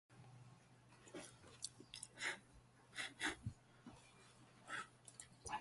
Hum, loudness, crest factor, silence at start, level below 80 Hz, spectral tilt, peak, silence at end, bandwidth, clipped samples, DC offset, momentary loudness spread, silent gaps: none; -50 LUFS; 26 dB; 0.1 s; -74 dBFS; -2.5 dB/octave; -28 dBFS; 0 s; 11.5 kHz; under 0.1%; under 0.1%; 20 LU; none